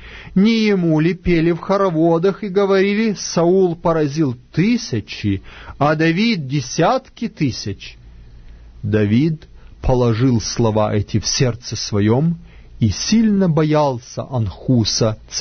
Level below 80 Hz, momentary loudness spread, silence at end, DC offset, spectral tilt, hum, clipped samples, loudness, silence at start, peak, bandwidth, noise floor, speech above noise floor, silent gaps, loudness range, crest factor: -36 dBFS; 9 LU; 0 s; under 0.1%; -5.5 dB/octave; none; under 0.1%; -17 LUFS; 0 s; -2 dBFS; 6.6 kHz; -39 dBFS; 22 dB; none; 4 LU; 14 dB